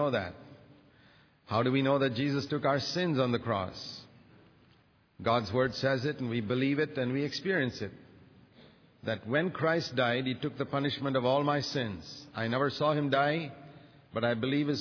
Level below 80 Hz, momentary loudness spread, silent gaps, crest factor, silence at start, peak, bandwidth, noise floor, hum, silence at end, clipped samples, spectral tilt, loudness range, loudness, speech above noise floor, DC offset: -68 dBFS; 13 LU; none; 18 dB; 0 s; -14 dBFS; 5.4 kHz; -65 dBFS; none; 0 s; under 0.1%; -4.5 dB/octave; 3 LU; -31 LUFS; 34 dB; under 0.1%